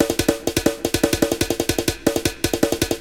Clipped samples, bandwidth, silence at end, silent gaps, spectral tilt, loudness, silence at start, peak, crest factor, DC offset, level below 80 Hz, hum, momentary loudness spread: under 0.1%; 17.5 kHz; 0 s; none; -4 dB/octave; -21 LUFS; 0 s; -2 dBFS; 20 dB; 0.3%; -36 dBFS; none; 2 LU